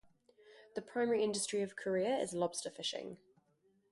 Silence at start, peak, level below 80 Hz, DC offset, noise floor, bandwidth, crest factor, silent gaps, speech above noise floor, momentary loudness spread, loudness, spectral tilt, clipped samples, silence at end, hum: 0.45 s; -22 dBFS; -80 dBFS; under 0.1%; -75 dBFS; 11.5 kHz; 16 dB; none; 38 dB; 14 LU; -37 LUFS; -3.5 dB/octave; under 0.1%; 0.75 s; none